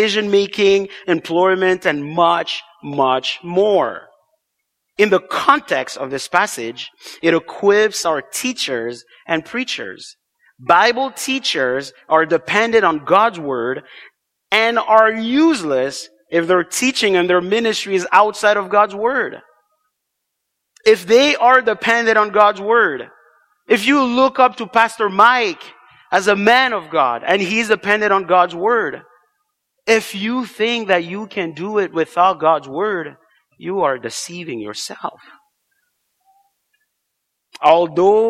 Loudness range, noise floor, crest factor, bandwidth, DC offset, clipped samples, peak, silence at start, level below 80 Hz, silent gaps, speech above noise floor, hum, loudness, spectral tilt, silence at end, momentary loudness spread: 5 LU; -76 dBFS; 16 dB; 15.5 kHz; under 0.1%; under 0.1%; 0 dBFS; 0 s; -62 dBFS; none; 60 dB; none; -16 LUFS; -3.5 dB/octave; 0 s; 13 LU